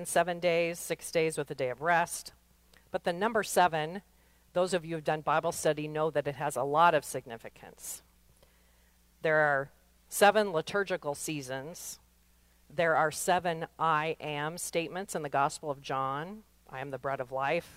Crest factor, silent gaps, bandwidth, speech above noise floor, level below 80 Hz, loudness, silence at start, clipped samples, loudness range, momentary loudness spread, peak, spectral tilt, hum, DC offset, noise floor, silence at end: 22 dB; none; 16 kHz; 34 dB; -66 dBFS; -31 LUFS; 0 s; under 0.1%; 3 LU; 16 LU; -10 dBFS; -4 dB/octave; none; under 0.1%; -65 dBFS; 0.05 s